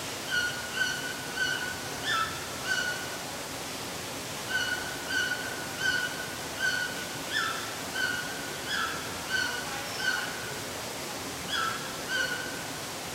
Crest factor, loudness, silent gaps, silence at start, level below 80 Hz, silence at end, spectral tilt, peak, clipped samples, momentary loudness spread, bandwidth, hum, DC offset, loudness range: 16 dB; -31 LUFS; none; 0 s; -60 dBFS; 0 s; -1.5 dB/octave; -16 dBFS; under 0.1%; 6 LU; 16 kHz; none; under 0.1%; 2 LU